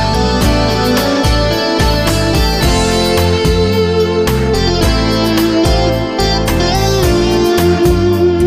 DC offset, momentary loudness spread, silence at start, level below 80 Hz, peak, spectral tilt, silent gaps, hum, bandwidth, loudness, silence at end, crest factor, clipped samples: under 0.1%; 2 LU; 0 s; -20 dBFS; 0 dBFS; -5.5 dB/octave; none; none; 15.5 kHz; -12 LUFS; 0 s; 10 dB; under 0.1%